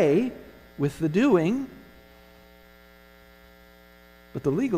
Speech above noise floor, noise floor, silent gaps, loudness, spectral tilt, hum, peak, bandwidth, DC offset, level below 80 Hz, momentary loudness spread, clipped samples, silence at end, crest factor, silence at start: 29 dB; -53 dBFS; none; -25 LUFS; -7.5 dB/octave; 60 Hz at -55 dBFS; -10 dBFS; 15 kHz; under 0.1%; -56 dBFS; 19 LU; under 0.1%; 0 s; 18 dB; 0 s